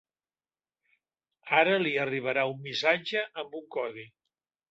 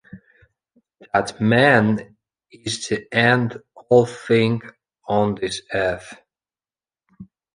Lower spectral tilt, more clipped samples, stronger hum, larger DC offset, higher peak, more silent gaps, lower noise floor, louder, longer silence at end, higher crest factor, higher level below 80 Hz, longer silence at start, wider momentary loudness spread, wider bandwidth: about the same, -5 dB/octave vs -5.5 dB/octave; neither; neither; neither; second, -10 dBFS vs -2 dBFS; neither; about the same, under -90 dBFS vs under -90 dBFS; second, -28 LUFS vs -19 LUFS; first, 0.65 s vs 0.3 s; about the same, 22 dB vs 20 dB; second, -78 dBFS vs -54 dBFS; first, 1.45 s vs 0.15 s; about the same, 13 LU vs 13 LU; second, 8 kHz vs 10.5 kHz